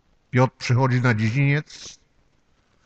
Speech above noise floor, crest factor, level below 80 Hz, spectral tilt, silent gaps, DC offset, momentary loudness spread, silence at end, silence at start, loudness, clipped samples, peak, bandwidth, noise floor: 42 dB; 18 dB; -54 dBFS; -7 dB/octave; none; under 0.1%; 19 LU; 0.95 s; 0.35 s; -21 LUFS; under 0.1%; -6 dBFS; 8 kHz; -63 dBFS